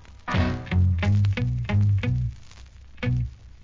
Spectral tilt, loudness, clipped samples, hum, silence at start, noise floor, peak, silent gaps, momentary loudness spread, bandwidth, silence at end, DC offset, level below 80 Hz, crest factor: -8 dB/octave; -25 LUFS; under 0.1%; none; 0.1 s; -44 dBFS; -12 dBFS; none; 7 LU; 7.4 kHz; 0 s; under 0.1%; -32 dBFS; 12 dB